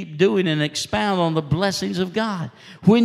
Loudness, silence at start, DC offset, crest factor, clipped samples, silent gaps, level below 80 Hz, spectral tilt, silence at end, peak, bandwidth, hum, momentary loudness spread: -21 LUFS; 0 s; under 0.1%; 18 dB; under 0.1%; none; -50 dBFS; -5.5 dB/octave; 0 s; -4 dBFS; 14.5 kHz; none; 7 LU